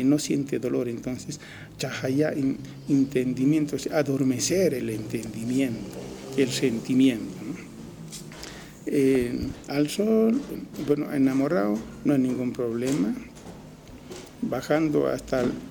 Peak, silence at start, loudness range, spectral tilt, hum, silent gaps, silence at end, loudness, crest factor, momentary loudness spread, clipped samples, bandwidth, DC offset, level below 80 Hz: -8 dBFS; 0 s; 3 LU; -5.5 dB/octave; none; none; 0 s; -26 LUFS; 16 dB; 17 LU; under 0.1%; 19.5 kHz; under 0.1%; -52 dBFS